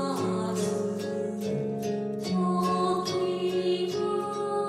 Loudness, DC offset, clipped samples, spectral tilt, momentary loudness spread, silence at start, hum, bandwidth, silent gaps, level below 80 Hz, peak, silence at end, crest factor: -29 LUFS; under 0.1%; under 0.1%; -6 dB/octave; 5 LU; 0 s; none; 15 kHz; none; -68 dBFS; -14 dBFS; 0 s; 14 dB